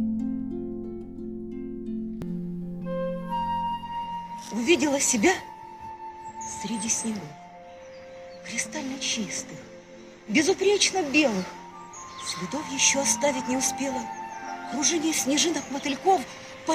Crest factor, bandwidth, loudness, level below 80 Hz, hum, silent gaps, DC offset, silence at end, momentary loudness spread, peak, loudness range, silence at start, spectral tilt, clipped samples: 20 dB; 16 kHz; -26 LUFS; -56 dBFS; none; none; under 0.1%; 0 s; 20 LU; -8 dBFS; 8 LU; 0 s; -2.5 dB/octave; under 0.1%